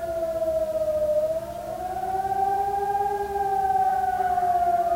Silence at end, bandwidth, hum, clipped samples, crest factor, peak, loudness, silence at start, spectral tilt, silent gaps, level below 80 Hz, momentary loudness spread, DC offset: 0 s; 16 kHz; none; under 0.1%; 10 dB; -14 dBFS; -25 LUFS; 0 s; -5.5 dB/octave; none; -50 dBFS; 7 LU; under 0.1%